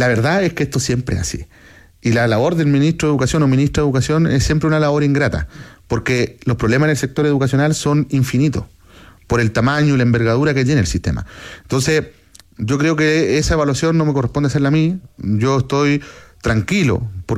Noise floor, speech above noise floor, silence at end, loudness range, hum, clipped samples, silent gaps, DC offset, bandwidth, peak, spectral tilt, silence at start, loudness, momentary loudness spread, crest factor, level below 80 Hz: -44 dBFS; 28 dB; 0 s; 2 LU; none; under 0.1%; none; under 0.1%; 14.5 kHz; -4 dBFS; -6 dB/octave; 0 s; -16 LUFS; 8 LU; 12 dB; -36 dBFS